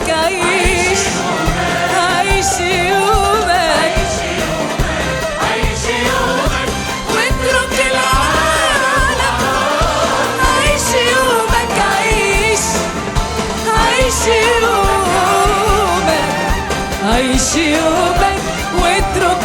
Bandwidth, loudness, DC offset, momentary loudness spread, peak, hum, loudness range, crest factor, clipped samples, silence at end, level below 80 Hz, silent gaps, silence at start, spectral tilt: 19.5 kHz; -13 LUFS; under 0.1%; 5 LU; 0 dBFS; none; 2 LU; 12 dB; under 0.1%; 0 s; -24 dBFS; none; 0 s; -3 dB/octave